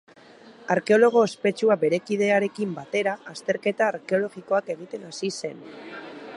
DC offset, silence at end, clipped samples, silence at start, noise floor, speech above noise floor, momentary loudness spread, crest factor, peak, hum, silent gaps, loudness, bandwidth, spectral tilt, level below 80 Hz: under 0.1%; 0 s; under 0.1%; 0.45 s; -49 dBFS; 26 dB; 18 LU; 18 dB; -6 dBFS; none; none; -24 LUFS; 11.5 kHz; -5 dB/octave; -76 dBFS